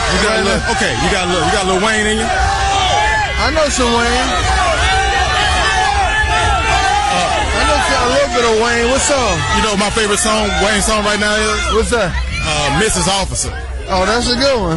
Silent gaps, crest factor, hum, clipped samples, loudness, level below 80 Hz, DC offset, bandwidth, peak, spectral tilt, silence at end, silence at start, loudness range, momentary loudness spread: none; 12 dB; none; under 0.1%; -13 LUFS; -24 dBFS; 0.3%; 11.5 kHz; -2 dBFS; -3 dB/octave; 0 s; 0 s; 1 LU; 2 LU